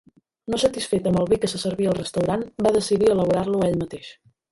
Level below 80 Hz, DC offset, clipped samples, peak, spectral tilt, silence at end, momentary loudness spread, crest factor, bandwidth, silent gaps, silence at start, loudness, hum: -50 dBFS; under 0.1%; under 0.1%; -6 dBFS; -5.5 dB/octave; 0.4 s; 10 LU; 16 dB; 11.5 kHz; none; 0.5 s; -22 LUFS; none